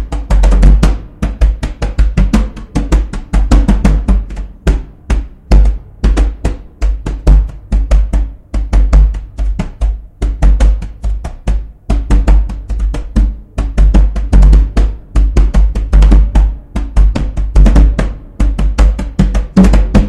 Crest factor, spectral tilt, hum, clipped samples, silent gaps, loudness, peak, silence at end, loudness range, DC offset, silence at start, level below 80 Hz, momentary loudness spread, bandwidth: 10 dB; -7.5 dB/octave; none; 1%; none; -14 LUFS; 0 dBFS; 0 s; 4 LU; under 0.1%; 0 s; -10 dBFS; 11 LU; 8.8 kHz